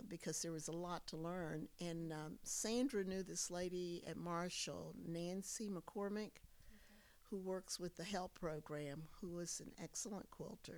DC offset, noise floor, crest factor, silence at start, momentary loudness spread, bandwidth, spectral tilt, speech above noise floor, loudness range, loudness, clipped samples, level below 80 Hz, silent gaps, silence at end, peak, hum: under 0.1%; -66 dBFS; 18 dB; 0 s; 8 LU; over 20 kHz; -4 dB/octave; 20 dB; 4 LU; -47 LUFS; under 0.1%; -68 dBFS; none; 0 s; -30 dBFS; none